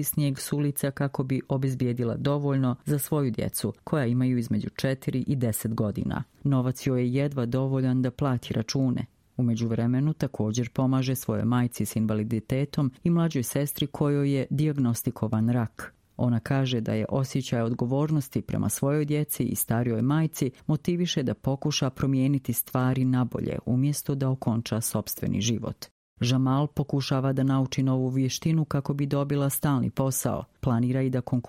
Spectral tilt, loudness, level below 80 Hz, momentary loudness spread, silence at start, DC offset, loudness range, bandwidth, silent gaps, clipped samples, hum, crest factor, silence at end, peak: -6 dB/octave; -27 LUFS; -54 dBFS; 4 LU; 0 s; under 0.1%; 1 LU; 16.5 kHz; 25.91-26.16 s; under 0.1%; none; 16 dB; 0.05 s; -10 dBFS